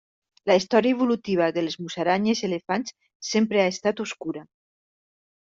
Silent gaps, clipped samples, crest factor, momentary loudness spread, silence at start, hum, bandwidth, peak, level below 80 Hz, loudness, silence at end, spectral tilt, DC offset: 3.15-3.20 s; under 0.1%; 20 dB; 12 LU; 0.45 s; none; 7.8 kHz; -6 dBFS; -68 dBFS; -24 LUFS; 1.05 s; -5 dB/octave; under 0.1%